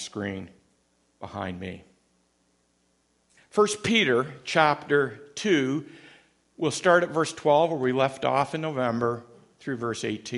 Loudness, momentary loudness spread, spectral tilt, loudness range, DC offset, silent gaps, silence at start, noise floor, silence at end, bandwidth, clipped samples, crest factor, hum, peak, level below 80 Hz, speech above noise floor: -25 LUFS; 16 LU; -4.5 dB/octave; 8 LU; under 0.1%; none; 0 s; -69 dBFS; 0 s; 11.5 kHz; under 0.1%; 24 dB; 60 Hz at -60 dBFS; -4 dBFS; -66 dBFS; 44 dB